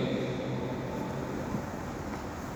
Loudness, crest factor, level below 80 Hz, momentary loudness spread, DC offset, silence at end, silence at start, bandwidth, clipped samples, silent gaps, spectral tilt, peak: -35 LUFS; 16 dB; -50 dBFS; 5 LU; under 0.1%; 0 s; 0 s; over 20 kHz; under 0.1%; none; -6.5 dB/octave; -18 dBFS